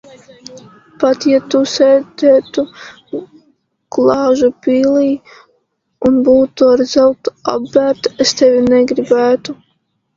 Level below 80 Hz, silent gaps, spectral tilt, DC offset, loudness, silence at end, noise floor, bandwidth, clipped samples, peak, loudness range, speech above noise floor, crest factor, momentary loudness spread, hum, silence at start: -52 dBFS; none; -4.5 dB/octave; under 0.1%; -12 LUFS; 0.6 s; -64 dBFS; 7.6 kHz; under 0.1%; 0 dBFS; 4 LU; 52 dB; 14 dB; 12 LU; none; 0.5 s